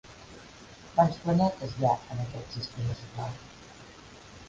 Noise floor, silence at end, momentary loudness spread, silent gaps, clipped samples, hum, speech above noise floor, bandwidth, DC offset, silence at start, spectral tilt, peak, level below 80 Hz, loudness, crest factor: -50 dBFS; 0 s; 23 LU; none; under 0.1%; none; 21 dB; 7.8 kHz; under 0.1%; 0.05 s; -7 dB/octave; -8 dBFS; -54 dBFS; -30 LUFS; 22 dB